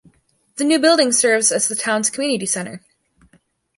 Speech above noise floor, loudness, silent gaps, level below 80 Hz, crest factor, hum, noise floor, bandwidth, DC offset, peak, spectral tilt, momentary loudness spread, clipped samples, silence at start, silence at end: 41 dB; -16 LUFS; none; -66 dBFS; 18 dB; none; -59 dBFS; 11.5 kHz; under 0.1%; -2 dBFS; -2 dB/octave; 10 LU; under 0.1%; 0.55 s; 1 s